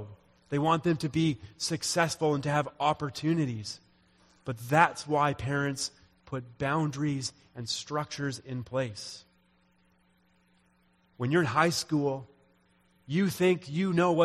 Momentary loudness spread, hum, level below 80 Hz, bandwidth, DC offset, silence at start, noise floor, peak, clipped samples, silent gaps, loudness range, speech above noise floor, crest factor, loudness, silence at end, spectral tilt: 14 LU; none; -62 dBFS; 14 kHz; under 0.1%; 0 s; -67 dBFS; -6 dBFS; under 0.1%; none; 7 LU; 38 dB; 24 dB; -30 LUFS; 0 s; -5 dB/octave